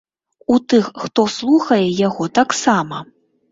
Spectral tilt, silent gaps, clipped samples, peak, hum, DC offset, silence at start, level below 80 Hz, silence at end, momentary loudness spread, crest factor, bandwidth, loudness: -5 dB/octave; none; under 0.1%; -2 dBFS; none; under 0.1%; 0.5 s; -56 dBFS; 0.5 s; 8 LU; 16 dB; 7.8 kHz; -16 LUFS